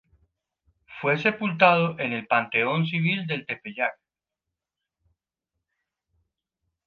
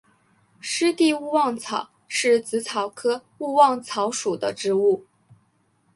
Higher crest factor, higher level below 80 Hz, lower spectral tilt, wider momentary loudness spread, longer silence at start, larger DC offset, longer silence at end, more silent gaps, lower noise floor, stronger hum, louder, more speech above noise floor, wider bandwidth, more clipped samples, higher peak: about the same, 24 dB vs 20 dB; about the same, -72 dBFS vs -72 dBFS; first, -7.5 dB/octave vs -3 dB/octave; about the same, 11 LU vs 10 LU; first, 0.9 s vs 0.65 s; neither; first, 2.95 s vs 0.95 s; neither; first, -87 dBFS vs -65 dBFS; neither; about the same, -24 LUFS vs -23 LUFS; first, 63 dB vs 43 dB; second, 6.6 kHz vs 11.5 kHz; neither; about the same, -4 dBFS vs -4 dBFS